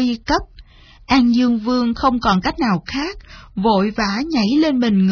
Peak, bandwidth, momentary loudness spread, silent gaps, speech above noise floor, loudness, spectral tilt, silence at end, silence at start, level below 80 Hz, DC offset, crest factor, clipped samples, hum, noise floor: -4 dBFS; 5.4 kHz; 8 LU; none; 26 dB; -17 LUFS; -6 dB/octave; 0 s; 0 s; -38 dBFS; under 0.1%; 14 dB; under 0.1%; none; -43 dBFS